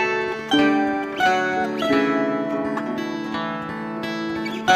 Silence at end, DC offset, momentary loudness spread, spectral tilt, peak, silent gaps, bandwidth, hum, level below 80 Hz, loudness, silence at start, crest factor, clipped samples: 0 s; under 0.1%; 8 LU; -4.5 dB/octave; -4 dBFS; none; 14.5 kHz; none; -58 dBFS; -22 LUFS; 0 s; 18 dB; under 0.1%